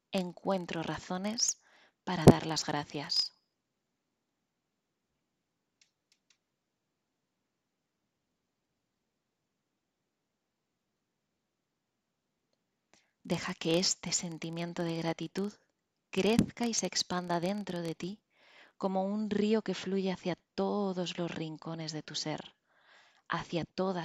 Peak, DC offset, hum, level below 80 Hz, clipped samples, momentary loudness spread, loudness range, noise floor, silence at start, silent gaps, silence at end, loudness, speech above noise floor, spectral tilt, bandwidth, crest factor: -4 dBFS; under 0.1%; none; -60 dBFS; under 0.1%; 10 LU; 8 LU; -85 dBFS; 0.1 s; none; 0 s; -33 LUFS; 52 dB; -4.5 dB/octave; 15 kHz; 32 dB